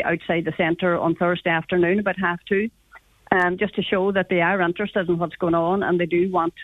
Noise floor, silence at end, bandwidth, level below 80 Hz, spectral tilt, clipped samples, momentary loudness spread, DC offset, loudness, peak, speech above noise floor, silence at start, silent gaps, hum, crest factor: -51 dBFS; 0 s; 4 kHz; -54 dBFS; -8 dB/octave; under 0.1%; 4 LU; under 0.1%; -22 LUFS; -4 dBFS; 29 dB; 0 s; none; none; 18 dB